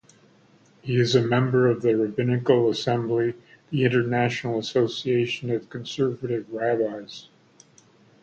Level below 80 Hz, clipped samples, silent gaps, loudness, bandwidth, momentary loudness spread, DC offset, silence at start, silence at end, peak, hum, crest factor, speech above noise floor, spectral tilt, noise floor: -62 dBFS; under 0.1%; none; -24 LUFS; 8.2 kHz; 10 LU; under 0.1%; 0.85 s; 1 s; -6 dBFS; none; 20 dB; 34 dB; -6.5 dB/octave; -57 dBFS